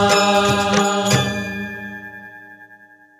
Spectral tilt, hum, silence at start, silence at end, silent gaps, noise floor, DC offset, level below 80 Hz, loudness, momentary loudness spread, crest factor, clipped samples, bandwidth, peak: -4 dB/octave; none; 0 s; 0.45 s; none; -47 dBFS; under 0.1%; -50 dBFS; -17 LUFS; 20 LU; 18 dB; under 0.1%; 15 kHz; -2 dBFS